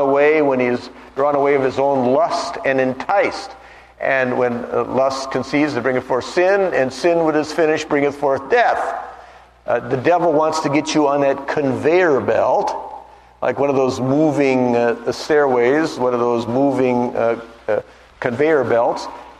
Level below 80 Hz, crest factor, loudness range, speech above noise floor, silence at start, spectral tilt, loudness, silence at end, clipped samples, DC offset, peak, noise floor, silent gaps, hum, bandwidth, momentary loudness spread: -54 dBFS; 16 dB; 2 LU; 26 dB; 0 s; -5.5 dB/octave; -17 LUFS; 0.05 s; under 0.1%; under 0.1%; 0 dBFS; -43 dBFS; none; none; 12 kHz; 8 LU